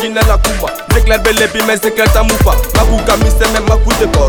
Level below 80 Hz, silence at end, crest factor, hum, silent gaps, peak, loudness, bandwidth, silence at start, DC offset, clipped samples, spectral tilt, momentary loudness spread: -14 dBFS; 0 s; 10 dB; none; none; 0 dBFS; -11 LUFS; 19.5 kHz; 0 s; under 0.1%; under 0.1%; -4.5 dB/octave; 3 LU